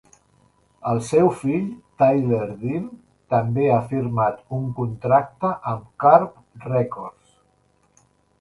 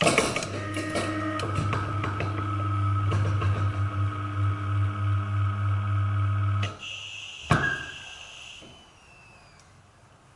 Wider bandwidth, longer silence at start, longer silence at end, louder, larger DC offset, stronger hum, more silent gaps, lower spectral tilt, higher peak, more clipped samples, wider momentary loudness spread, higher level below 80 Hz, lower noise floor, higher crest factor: about the same, 11.5 kHz vs 11.5 kHz; first, 0.85 s vs 0 s; first, 1.3 s vs 1.05 s; first, -21 LUFS vs -28 LUFS; neither; neither; neither; first, -8.5 dB/octave vs -5.5 dB/octave; first, -2 dBFS vs -6 dBFS; neither; about the same, 13 LU vs 12 LU; about the same, -56 dBFS vs -52 dBFS; first, -62 dBFS vs -55 dBFS; about the same, 22 dB vs 22 dB